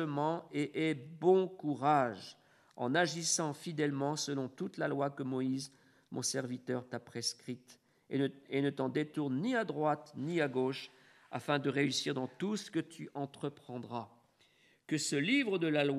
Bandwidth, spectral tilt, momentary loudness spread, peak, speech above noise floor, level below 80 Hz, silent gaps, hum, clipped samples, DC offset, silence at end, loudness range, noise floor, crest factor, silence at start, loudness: 13.5 kHz; -4.5 dB/octave; 13 LU; -16 dBFS; 34 dB; -84 dBFS; none; none; under 0.1%; under 0.1%; 0 s; 5 LU; -69 dBFS; 20 dB; 0 s; -35 LUFS